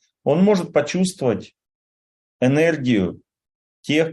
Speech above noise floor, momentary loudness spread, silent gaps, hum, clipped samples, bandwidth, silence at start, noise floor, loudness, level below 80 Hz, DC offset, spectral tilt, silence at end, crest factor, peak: over 71 dB; 8 LU; 1.75-2.39 s, 3.55-3.83 s; none; under 0.1%; 12 kHz; 0.25 s; under -90 dBFS; -20 LUFS; -62 dBFS; under 0.1%; -6 dB/octave; 0 s; 16 dB; -4 dBFS